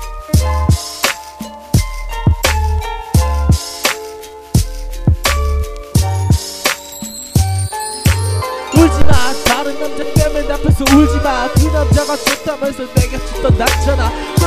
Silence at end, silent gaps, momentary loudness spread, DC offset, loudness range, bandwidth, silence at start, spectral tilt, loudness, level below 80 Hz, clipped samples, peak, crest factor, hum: 0 s; none; 9 LU; under 0.1%; 3 LU; 16 kHz; 0 s; -5 dB/octave; -15 LUFS; -22 dBFS; 0.1%; 0 dBFS; 14 dB; none